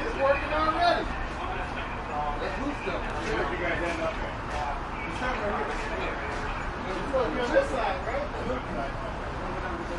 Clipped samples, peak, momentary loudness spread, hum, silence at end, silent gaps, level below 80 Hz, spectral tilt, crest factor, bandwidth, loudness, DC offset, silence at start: under 0.1%; -10 dBFS; 8 LU; none; 0 s; none; -38 dBFS; -5.5 dB/octave; 18 dB; 11.5 kHz; -30 LUFS; under 0.1%; 0 s